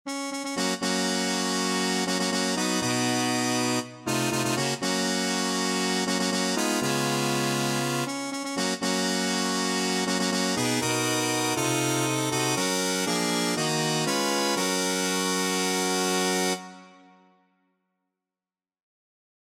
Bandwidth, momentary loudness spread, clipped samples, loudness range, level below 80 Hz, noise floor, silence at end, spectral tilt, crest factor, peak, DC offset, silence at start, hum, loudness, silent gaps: 16.5 kHz; 3 LU; under 0.1%; 2 LU; -68 dBFS; under -90 dBFS; 2.65 s; -3 dB/octave; 14 dB; -12 dBFS; under 0.1%; 0.05 s; none; -25 LUFS; none